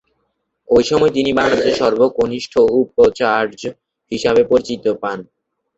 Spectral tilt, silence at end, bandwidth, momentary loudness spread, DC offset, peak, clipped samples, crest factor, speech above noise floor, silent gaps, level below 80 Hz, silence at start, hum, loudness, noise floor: -5 dB/octave; 0.55 s; 8 kHz; 11 LU; under 0.1%; -2 dBFS; under 0.1%; 14 dB; 54 dB; none; -48 dBFS; 0.7 s; none; -15 LUFS; -69 dBFS